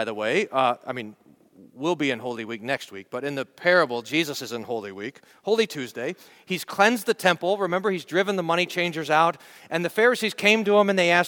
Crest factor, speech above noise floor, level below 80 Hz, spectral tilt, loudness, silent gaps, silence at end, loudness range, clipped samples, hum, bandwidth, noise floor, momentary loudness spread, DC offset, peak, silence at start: 22 dB; 29 dB; -74 dBFS; -4 dB/octave; -24 LUFS; none; 0 s; 5 LU; under 0.1%; none; 19 kHz; -53 dBFS; 13 LU; under 0.1%; -4 dBFS; 0 s